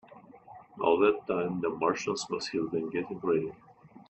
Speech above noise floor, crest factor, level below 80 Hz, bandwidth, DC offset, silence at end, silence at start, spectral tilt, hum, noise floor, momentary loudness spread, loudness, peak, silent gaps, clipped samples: 23 dB; 20 dB; -68 dBFS; 8.4 kHz; under 0.1%; 0.1 s; 0.1 s; -5 dB/octave; none; -52 dBFS; 8 LU; -30 LUFS; -12 dBFS; none; under 0.1%